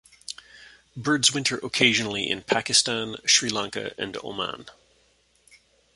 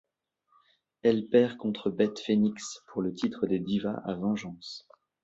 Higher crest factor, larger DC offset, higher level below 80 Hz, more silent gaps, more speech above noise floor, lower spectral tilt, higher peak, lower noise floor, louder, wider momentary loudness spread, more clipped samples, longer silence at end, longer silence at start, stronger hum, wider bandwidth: about the same, 24 dB vs 20 dB; neither; about the same, -62 dBFS vs -66 dBFS; neither; second, 39 dB vs 46 dB; second, -1.5 dB/octave vs -6 dB/octave; first, -2 dBFS vs -10 dBFS; second, -64 dBFS vs -75 dBFS; first, -23 LUFS vs -29 LUFS; first, 19 LU vs 15 LU; neither; first, 1.25 s vs 0.45 s; second, 0.3 s vs 1.05 s; neither; first, 11.5 kHz vs 8 kHz